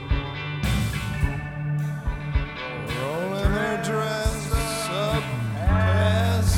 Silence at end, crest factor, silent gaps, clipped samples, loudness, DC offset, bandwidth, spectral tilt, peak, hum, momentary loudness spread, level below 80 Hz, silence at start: 0 s; 16 dB; none; under 0.1%; -25 LUFS; under 0.1%; 17 kHz; -5.5 dB/octave; -8 dBFS; none; 8 LU; -30 dBFS; 0 s